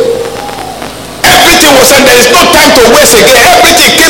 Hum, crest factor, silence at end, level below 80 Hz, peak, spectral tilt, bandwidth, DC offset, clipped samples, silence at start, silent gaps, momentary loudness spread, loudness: none; 4 dB; 0 s; -28 dBFS; 0 dBFS; -1.5 dB/octave; over 20 kHz; under 0.1%; 8%; 0 s; none; 17 LU; -1 LUFS